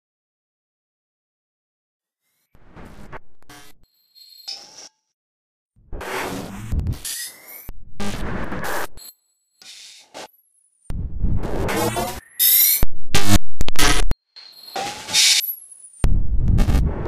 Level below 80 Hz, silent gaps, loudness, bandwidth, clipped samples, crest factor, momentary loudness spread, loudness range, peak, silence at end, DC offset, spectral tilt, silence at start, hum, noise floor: -28 dBFS; 5.14-5.66 s; -20 LUFS; 15.5 kHz; under 0.1%; 16 dB; 27 LU; 22 LU; -2 dBFS; 0 s; under 0.1%; -3 dB/octave; 2.6 s; none; -73 dBFS